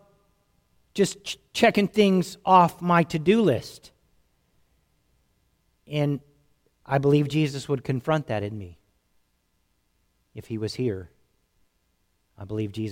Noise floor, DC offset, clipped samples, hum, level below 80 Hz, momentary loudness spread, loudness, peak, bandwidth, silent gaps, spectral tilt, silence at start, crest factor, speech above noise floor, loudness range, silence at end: -71 dBFS; under 0.1%; under 0.1%; none; -60 dBFS; 17 LU; -24 LUFS; -4 dBFS; 16.5 kHz; none; -6 dB/octave; 0.95 s; 22 dB; 48 dB; 14 LU; 0 s